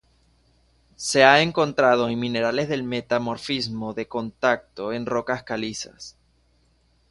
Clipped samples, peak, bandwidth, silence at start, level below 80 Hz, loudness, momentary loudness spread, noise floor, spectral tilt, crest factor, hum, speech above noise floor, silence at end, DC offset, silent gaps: under 0.1%; 0 dBFS; 11.5 kHz; 1 s; -58 dBFS; -22 LUFS; 14 LU; -63 dBFS; -4 dB/octave; 24 dB; none; 40 dB; 1 s; under 0.1%; none